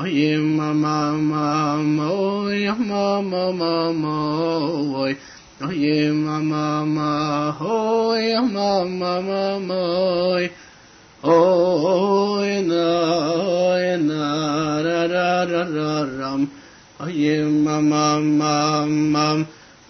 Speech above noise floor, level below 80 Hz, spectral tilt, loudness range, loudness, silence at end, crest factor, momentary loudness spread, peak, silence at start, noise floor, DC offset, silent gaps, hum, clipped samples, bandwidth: 28 dB; -58 dBFS; -6 dB/octave; 3 LU; -20 LUFS; 0.35 s; 18 dB; 5 LU; -2 dBFS; 0 s; -47 dBFS; under 0.1%; none; none; under 0.1%; 6.6 kHz